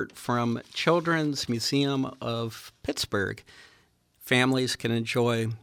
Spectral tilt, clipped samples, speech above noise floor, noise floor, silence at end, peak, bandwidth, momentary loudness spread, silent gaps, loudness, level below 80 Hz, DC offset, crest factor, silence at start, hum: -5 dB/octave; under 0.1%; 36 dB; -63 dBFS; 0.05 s; -10 dBFS; 17.5 kHz; 10 LU; none; -27 LUFS; -62 dBFS; under 0.1%; 18 dB; 0 s; none